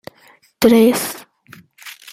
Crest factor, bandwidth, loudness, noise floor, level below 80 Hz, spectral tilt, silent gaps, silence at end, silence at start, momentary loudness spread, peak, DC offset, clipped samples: 18 dB; 16 kHz; -14 LUFS; -51 dBFS; -54 dBFS; -4.5 dB/octave; none; 0.2 s; 0.6 s; 25 LU; 0 dBFS; under 0.1%; under 0.1%